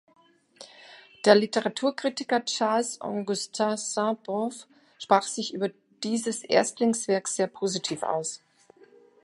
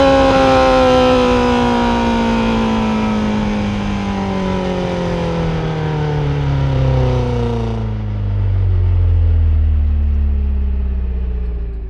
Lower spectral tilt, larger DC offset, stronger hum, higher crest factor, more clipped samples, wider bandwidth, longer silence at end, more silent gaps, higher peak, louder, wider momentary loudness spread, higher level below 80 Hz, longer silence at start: second, -3.5 dB/octave vs -7.5 dB/octave; neither; neither; first, 24 dB vs 14 dB; neither; first, 11.5 kHz vs 10 kHz; first, 0.85 s vs 0 s; neither; second, -4 dBFS vs 0 dBFS; second, -27 LUFS vs -16 LUFS; about the same, 11 LU vs 9 LU; second, -78 dBFS vs -20 dBFS; first, 0.6 s vs 0 s